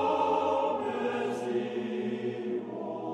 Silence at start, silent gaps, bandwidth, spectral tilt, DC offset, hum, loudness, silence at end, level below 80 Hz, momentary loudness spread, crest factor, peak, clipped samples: 0 s; none; 11 kHz; -6 dB/octave; under 0.1%; none; -31 LUFS; 0 s; -76 dBFS; 8 LU; 14 dB; -16 dBFS; under 0.1%